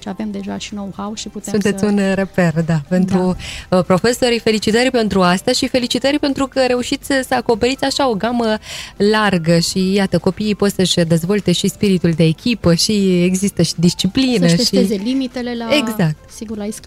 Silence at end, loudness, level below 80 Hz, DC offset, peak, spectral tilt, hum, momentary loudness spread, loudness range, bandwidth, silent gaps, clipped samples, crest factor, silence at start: 0.05 s; -16 LUFS; -42 dBFS; under 0.1%; -4 dBFS; -5 dB/octave; none; 11 LU; 2 LU; 15.5 kHz; none; under 0.1%; 12 dB; 0.05 s